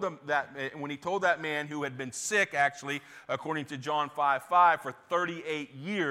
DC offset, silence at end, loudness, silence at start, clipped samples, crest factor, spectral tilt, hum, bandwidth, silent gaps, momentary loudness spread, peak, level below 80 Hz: under 0.1%; 0 s; -30 LUFS; 0 s; under 0.1%; 20 dB; -3.5 dB/octave; none; 16 kHz; none; 12 LU; -12 dBFS; -80 dBFS